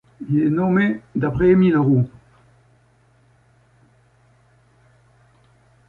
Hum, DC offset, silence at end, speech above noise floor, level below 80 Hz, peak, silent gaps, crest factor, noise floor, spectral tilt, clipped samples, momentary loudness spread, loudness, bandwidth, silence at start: none; under 0.1%; 3.8 s; 40 dB; -48 dBFS; -4 dBFS; none; 16 dB; -57 dBFS; -10.5 dB/octave; under 0.1%; 9 LU; -18 LUFS; 4.2 kHz; 0.2 s